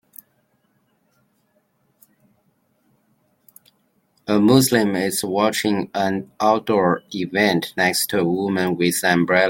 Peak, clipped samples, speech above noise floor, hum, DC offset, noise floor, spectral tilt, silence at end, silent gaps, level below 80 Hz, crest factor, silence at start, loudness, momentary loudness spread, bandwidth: -2 dBFS; under 0.1%; 47 dB; none; under 0.1%; -65 dBFS; -4.5 dB/octave; 0 s; none; -62 dBFS; 20 dB; 4.25 s; -19 LUFS; 7 LU; 17 kHz